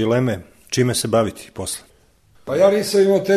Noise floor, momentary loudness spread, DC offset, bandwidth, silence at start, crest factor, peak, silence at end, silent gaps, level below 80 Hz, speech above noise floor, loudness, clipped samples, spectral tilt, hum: -54 dBFS; 14 LU; 0.1%; 13.5 kHz; 0 s; 16 dB; -2 dBFS; 0 s; none; -52 dBFS; 37 dB; -19 LUFS; under 0.1%; -5 dB/octave; none